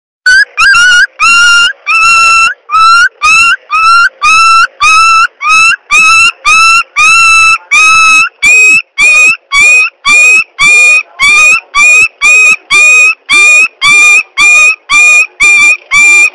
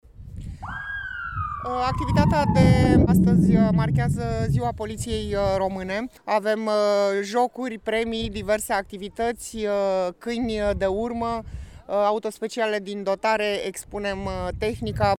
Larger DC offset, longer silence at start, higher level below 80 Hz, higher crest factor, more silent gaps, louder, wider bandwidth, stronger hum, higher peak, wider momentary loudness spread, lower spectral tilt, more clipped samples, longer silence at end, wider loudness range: neither; about the same, 0.25 s vs 0.2 s; about the same, -38 dBFS vs -38 dBFS; second, 4 dB vs 18 dB; neither; first, -2 LUFS vs -24 LUFS; about the same, 16.5 kHz vs 15 kHz; neither; first, 0 dBFS vs -4 dBFS; second, 4 LU vs 13 LU; second, 2 dB/octave vs -6.5 dB/octave; neither; about the same, 0.05 s vs 0 s; second, 2 LU vs 6 LU